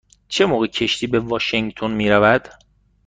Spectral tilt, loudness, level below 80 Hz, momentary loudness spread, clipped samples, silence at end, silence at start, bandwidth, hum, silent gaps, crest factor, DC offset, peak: -5 dB/octave; -18 LUFS; -48 dBFS; 7 LU; under 0.1%; 0.55 s; 0.3 s; 9.4 kHz; none; none; 16 dB; under 0.1%; -2 dBFS